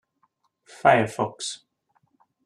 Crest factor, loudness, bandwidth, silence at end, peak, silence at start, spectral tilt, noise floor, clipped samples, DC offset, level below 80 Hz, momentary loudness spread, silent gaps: 24 dB; -23 LUFS; 12.5 kHz; 0.9 s; -4 dBFS; 0.85 s; -4.5 dB/octave; -70 dBFS; under 0.1%; under 0.1%; -70 dBFS; 14 LU; none